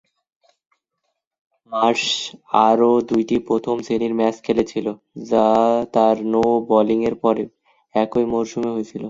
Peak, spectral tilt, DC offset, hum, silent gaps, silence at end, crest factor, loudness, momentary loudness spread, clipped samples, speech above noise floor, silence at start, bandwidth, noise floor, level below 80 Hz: 0 dBFS; -5 dB/octave; under 0.1%; none; none; 0 s; 20 dB; -19 LUFS; 9 LU; under 0.1%; 57 dB; 1.7 s; 7.8 kHz; -76 dBFS; -56 dBFS